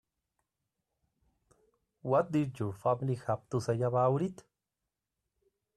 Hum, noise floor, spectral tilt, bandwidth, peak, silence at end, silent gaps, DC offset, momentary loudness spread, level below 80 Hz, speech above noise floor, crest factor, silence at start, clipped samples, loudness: none; -89 dBFS; -8 dB/octave; 12 kHz; -16 dBFS; 1.45 s; none; under 0.1%; 7 LU; -70 dBFS; 57 dB; 18 dB; 2.05 s; under 0.1%; -32 LUFS